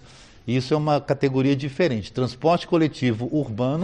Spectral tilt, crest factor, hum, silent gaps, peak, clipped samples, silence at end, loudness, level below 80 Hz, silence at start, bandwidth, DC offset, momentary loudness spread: -7.5 dB/octave; 16 dB; none; none; -6 dBFS; under 0.1%; 0 s; -23 LUFS; -54 dBFS; 0.45 s; 9.6 kHz; under 0.1%; 5 LU